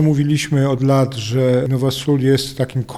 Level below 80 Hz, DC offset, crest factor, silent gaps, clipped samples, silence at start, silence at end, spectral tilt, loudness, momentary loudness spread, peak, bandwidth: -48 dBFS; under 0.1%; 12 dB; none; under 0.1%; 0 s; 0 s; -6.5 dB/octave; -17 LUFS; 3 LU; -4 dBFS; 13.5 kHz